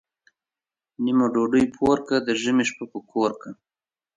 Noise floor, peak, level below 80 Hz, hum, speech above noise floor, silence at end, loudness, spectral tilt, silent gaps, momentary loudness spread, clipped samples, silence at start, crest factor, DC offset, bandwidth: under -90 dBFS; -8 dBFS; -58 dBFS; none; over 68 dB; 0.65 s; -23 LUFS; -5 dB/octave; none; 11 LU; under 0.1%; 1 s; 16 dB; under 0.1%; 9.6 kHz